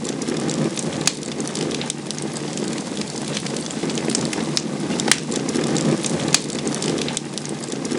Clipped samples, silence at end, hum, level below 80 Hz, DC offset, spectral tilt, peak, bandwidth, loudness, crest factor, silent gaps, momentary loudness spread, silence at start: under 0.1%; 0 s; none; -58 dBFS; under 0.1%; -3.5 dB/octave; 0 dBFS; over 20 kHz; -23 LUFS; 24 dB; none; 7 LU; 0 s